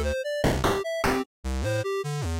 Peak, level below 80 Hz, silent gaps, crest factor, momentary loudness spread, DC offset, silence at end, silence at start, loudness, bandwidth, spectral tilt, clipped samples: -14 dBFS; -36 dBFS; 1.26-1.43 s; 12 dB; 5 LU; under 0.1%; 0 s; 0 s; -27 LUFS; 17 kHz; -5.5 dB/octave; under 0.1%